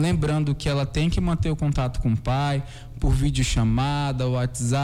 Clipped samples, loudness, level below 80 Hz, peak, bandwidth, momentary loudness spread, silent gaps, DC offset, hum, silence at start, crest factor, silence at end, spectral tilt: under 0.1%; -24 LUFS; -30 dBFS; -10 dBFS; 13 kHz; 3 LU; none; under 0.1%; none; 0 s; 12 dB; 0 s; -6 dB/octave